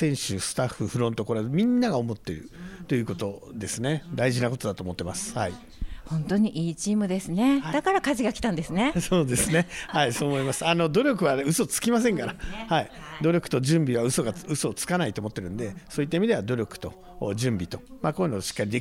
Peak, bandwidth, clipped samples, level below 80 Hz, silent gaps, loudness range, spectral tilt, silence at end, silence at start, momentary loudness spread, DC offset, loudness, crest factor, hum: -8 dBFS; 16 kHz; under 0.1%; -48 dBFS; none; 5 LU; -5 dB/octave; 0 s; 0 s; 11 LU; under 0.1%; -26 LUFS; 18 dB; none